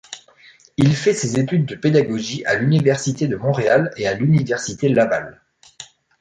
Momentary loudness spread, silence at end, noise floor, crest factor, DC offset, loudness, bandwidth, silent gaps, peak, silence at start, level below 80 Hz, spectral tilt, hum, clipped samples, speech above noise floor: 20 LU; 0.35 s; -49 dBFS; 16 dB; under 0.1%; -18 LUFS; 9.4 kHz; none; -2 dBFS; 0.1 s; -54 dBFS; -6 dB/octave; none; under 0.1%; 32 dB